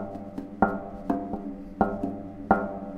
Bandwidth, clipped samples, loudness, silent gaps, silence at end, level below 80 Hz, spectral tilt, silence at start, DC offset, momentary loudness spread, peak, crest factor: 6.4 kHz; under 0.1%; -30 LUFS; none; 0 s; -48 dBFS; -9.5 dB/octave; 0 s; under 0.1%; 12 LU; -4 dBFS; 26 dB